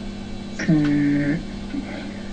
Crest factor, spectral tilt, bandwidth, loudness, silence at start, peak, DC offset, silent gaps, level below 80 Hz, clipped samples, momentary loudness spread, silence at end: 16 dB; -7 dB/octave; 9 kHz; -23 LUFS; 0 s; -8 dBFS; under 0.1%; none; -38 dBFS; under 0.1%; 14 LU; 0 s